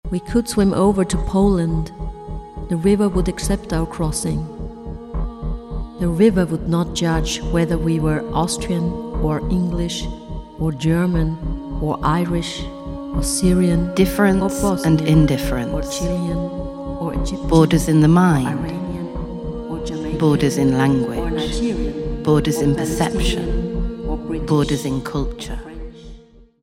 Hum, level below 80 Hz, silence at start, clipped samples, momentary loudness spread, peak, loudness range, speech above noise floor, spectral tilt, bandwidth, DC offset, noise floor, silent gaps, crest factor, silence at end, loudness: none; -28 dBFS; 0.05 s; under 0.1%; 13 LU; -2 dBFS; 4 LU; 26 dB; -6 dB/octave; 16 kHz; under 0.1%; -44 dBFS; none; 18 dB; 0.45 s; -19 LUFS